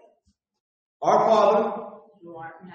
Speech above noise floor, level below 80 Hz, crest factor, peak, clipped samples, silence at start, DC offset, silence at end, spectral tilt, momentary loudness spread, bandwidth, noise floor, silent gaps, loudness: 47 dB; -70 dBFS; 18 dB; -8 dBFS; under 0.1%; 1 s; under 0.1%; 0.05 s; -5.5 dB/octave; 22 LU; 7.4 kHz; -69 dBFS; none; -21 LUFS